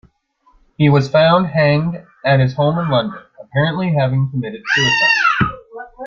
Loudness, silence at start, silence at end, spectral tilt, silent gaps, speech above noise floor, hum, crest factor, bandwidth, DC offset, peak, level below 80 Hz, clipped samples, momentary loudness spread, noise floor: -15 LUFS; 0.8 s; 0 s; -6 dB/octave; none; 41 dB; none; 14 dB; 7.2 kHz; under 0.1%; -2 dBFS; -46 dBFS; under 0.1%; 12 LU; -56 dBFS